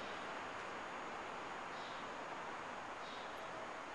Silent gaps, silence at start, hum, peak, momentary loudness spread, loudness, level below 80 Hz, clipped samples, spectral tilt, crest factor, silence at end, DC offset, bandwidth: none; 0 s; none; -34 dBFS; 1 LU; -47 LUFS; -76 dBFS; under 0.1%; -3 dB/octave; 12 dB; 0 s; under 0.1%; 11 kHz